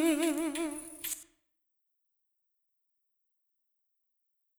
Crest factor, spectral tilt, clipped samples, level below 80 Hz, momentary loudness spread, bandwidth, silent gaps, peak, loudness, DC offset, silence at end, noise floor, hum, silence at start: 20 dB; -1.5 dB/octave; under 0.1%; -72 dBFS; 10 LU; over 20 kHz; none; -18 dBFS; -34 LUFS; under 0.1%; 3.35 s; -81 dBFS; none; 0 s